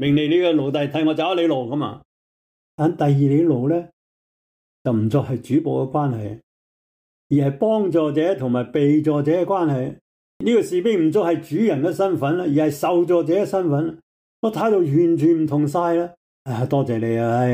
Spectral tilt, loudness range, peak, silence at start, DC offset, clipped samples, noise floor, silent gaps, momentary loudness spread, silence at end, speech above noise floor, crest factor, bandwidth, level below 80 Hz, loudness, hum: -8 dB/octave; 3 LU; -8 dBFS; 0 s; under 0.1%; under 0.1%; under -90 dBFS; 2.05-2.78 s, 3.93-4.85 s, 6.43-7.30 s, 10.01-10.40 s, 14.03-14.43 s, 16.17-16.45 s; 8 LU; 0 s; over 71 dB; 12 dB; 15.5 kHz; -60 dBFS; -20 LUFS; none